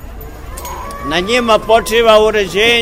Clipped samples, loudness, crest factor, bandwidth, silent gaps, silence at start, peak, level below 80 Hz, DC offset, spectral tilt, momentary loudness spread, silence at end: under 0.1%; -11 LUFS; 12 dB; 16.5 kHz; none; 0 s; 0 dBFS; -30 dBFS; 0.3%; -3 dB/octave; 20 LU; 0 s